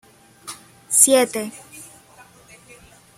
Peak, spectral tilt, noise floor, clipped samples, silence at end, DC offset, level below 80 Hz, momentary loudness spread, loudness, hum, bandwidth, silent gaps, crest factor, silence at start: 0 dBFS; -1 dB/octave; -49 dBFS; under 0.1%; 1.35 s; under 0.1%; -64 dBFS; 27 LU; -16 LUFS; none; 16.5 kHz; none; 24 dB; 0.45 s